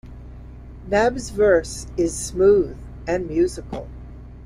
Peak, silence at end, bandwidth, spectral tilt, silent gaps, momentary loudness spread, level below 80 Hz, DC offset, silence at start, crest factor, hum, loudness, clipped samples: -4 dBFS; 0 s; 14.5 kHz; -5 dB/octave; none; 24 LU; -38 dBFS; under 0.1%; 0.05 s; 18 dB; none; -20 LUFS; under 0.1%